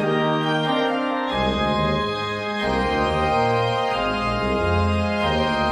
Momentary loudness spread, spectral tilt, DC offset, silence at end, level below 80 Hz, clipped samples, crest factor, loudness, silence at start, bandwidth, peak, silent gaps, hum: 3 LU; -6 dB/octave; under 0.1%; 0 s; -36 dBFS; under 0.1%; 14 dB; -21 LUFS; 0 s; 11 kHz; -8 dBFS; none; none